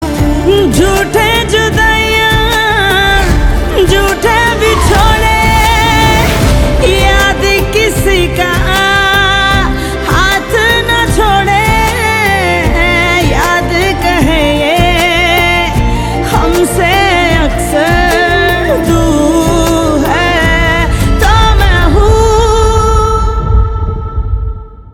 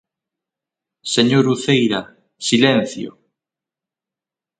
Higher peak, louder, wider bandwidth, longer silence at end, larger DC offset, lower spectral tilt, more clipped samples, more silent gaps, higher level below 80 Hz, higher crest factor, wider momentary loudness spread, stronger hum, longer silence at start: about the same, 0 dBFS vs 0 dBFS; first, -9 LUFS vs -17 LUFS; first, 19.5 kHz vs 9.4 kHz; second, 0 s vs 1.5 s; neither; about the same, -4.5 dB/octave vs -4.5 dB/octave; neither; neither; first, -14 dBFS vs -62 dBFS; second, 8 dB vs 20 dB; second, 4 LU vs 16 LU; neither; second, 0 s vs 1.05 s